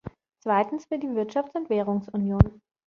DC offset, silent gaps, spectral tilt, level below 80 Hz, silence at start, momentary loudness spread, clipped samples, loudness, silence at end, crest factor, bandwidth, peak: under 0.1%; none; -9.5 dB/octave; -38 dBFS; 0.05 s; 8 LU; under 0.1%; -26 LUFS; 0.35 s; 24 dB; 6.8 kHz; -2 dBFS